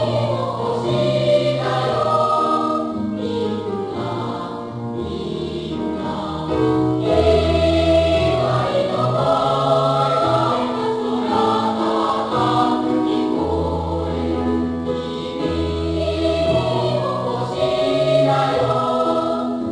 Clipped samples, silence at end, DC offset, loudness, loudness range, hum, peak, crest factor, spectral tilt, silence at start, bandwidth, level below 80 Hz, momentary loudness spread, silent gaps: under 0.1%; 0 s; under 0.1%; -19 LUFS; 6 LU; none; -4 dBFS; 16 dB; -7 dB/octave; 0 s; 10.5 kHz; -38 dBFS; 8 LU; none